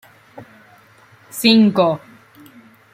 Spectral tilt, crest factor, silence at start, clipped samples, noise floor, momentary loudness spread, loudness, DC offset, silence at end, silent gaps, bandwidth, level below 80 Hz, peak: -5 dB/octave; 18 dB; 0.35 s; under 0.1%; -49 dBFS; 17 LU; -15 LUFS; under 0.1%; 0.95 s; none; 16 kHz; -64 dBFS; -2 dBFS